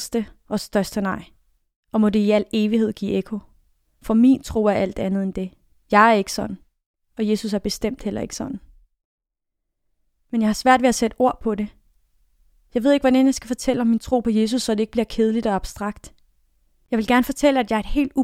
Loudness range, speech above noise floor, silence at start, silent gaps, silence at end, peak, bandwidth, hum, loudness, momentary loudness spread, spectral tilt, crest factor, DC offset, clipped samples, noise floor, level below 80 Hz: 6 LU; 60 dB; 0 s; 1.76-1.83 s, 6.86-6.94 s, 9.05-9.18 s; 0 s; 0 dBFS; 16 kHz; none; -21 LUFS; 14 LU; -5 dB/octave; 20 dB; under 0.1%; under 0.1%; -80 dBFS; -42 dBFS